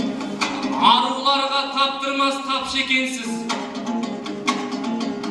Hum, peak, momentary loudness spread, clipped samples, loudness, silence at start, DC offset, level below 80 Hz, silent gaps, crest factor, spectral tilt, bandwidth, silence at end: none; -2 dBFS; 10 LU; under 0.1%; -21 LUFS; 0 s; under 0.1%; -60 dBFS; none; 20 dB; -2.5 dB/octave; 12.5 kHz; 0 s